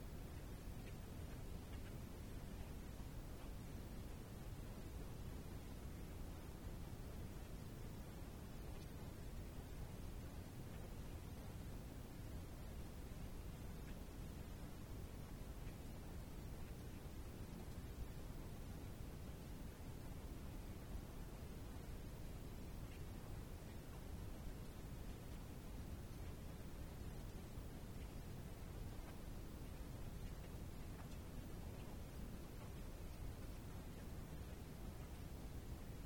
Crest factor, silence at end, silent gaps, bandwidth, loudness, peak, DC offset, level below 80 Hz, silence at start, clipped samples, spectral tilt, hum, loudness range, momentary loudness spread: 14 dB; 0 s; none; 19 kHz; -54 LUFS; -36 dBFS; under 0.1%; -54 dBFS; 0 s; under 0.1%; -6 dB/octave; none; 0 LU; 1 LU